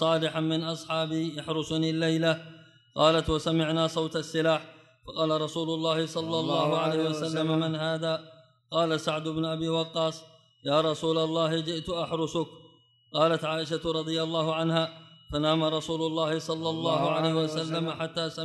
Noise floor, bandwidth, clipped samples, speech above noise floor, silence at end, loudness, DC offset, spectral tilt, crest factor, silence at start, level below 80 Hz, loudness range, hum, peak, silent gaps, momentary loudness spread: -59 dBFS; 12 kHz; under 0.1%; 31 dB; 0 s; -28 LUFS; under 0.1%; -5.5 dB/octave; 20 dB; 0 s; -56 dBFS; 2 LU; none; -8 dBFS; none; 6 LU